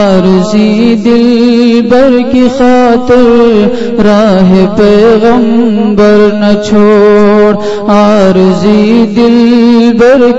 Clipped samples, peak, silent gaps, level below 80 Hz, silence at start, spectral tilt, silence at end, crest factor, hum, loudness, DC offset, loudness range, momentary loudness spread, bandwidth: 8%; 0 dBFS; none; -32 dBFS; 0 s; -7 dB/octave; 0 s; 4 dB; none; -5 LUFS; under 0.1%; 1 LU; 3 LU; 8 kHz